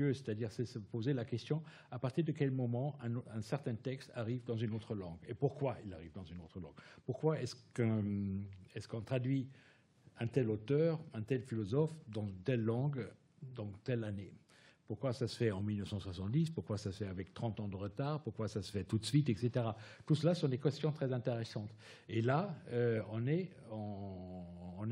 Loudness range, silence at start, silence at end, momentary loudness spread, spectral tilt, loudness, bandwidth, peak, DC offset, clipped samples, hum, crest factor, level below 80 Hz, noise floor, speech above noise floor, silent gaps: 5 LU; 0 s; 0 s; 14 LU; -7.5 dB/octave; -39 LUFS; 11.5 kHz; -20 dBFS; under 0.1%; under 0.1%; none; 20 dB; -76 dBFS; -66 dBFS; 27 dB; none